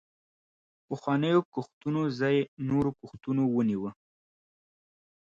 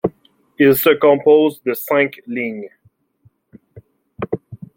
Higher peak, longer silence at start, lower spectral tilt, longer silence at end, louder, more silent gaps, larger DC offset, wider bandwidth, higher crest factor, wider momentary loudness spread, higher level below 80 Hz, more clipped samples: second, -12 dBFS vs -2 dBFS; first, 0.9 s vs 0.05 s; first, -8 dB/octave vs -5.5 dB/octave; first, 1.45 s vs 0.2 s; second, -29 LUFS vs -16 LUFS; first, 1.45-1.52 s, 1.73-1.81 s, 2.48-2.57 s vs none; neither; second, 7.6 kHz vs 16.5 kHz; about the same, 18 dB vs 16 dB; second, 12 LU vs 16 LU; about the same, -64 dBFS vs -60 dBFS; neither